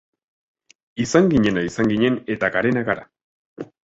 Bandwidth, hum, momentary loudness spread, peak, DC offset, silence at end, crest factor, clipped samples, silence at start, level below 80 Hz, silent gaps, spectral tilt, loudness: 8 kHz; none; 15 LU; -2 dBFS; under 0.1%; 0.2 s; 20 dB; under 0.1%; 0.95 s; -48 dBFS; 3.24-3.56 s; -6 dB/octave; -20 LUFS